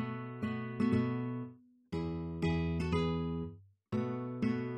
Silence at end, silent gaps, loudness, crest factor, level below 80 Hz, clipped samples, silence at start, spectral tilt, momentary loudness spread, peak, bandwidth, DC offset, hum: 0 s; none; -36 LUFS; 16 dB; -52 dBFS; under 0.1%; 0 s; -8.5 dB/octave; 9 LU; -20 dBFS; 9.4 kHz; under 0.1%; none